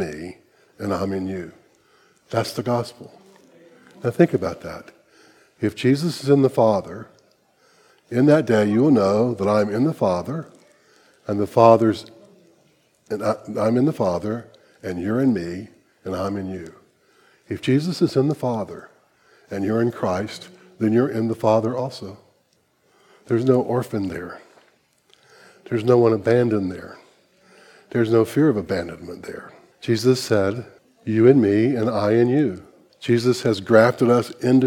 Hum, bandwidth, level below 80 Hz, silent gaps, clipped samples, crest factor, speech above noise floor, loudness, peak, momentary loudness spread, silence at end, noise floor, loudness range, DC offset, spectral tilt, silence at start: none; 16.5 kHz; -60 dBFS; none; under 0.1%; 22 dB; 44 dB; -20 LUFS; 0 dBFS; 18 LU; 0 s; -64 dBFS; 7 LU; under 0.1%; -7 dB/octave; 0 s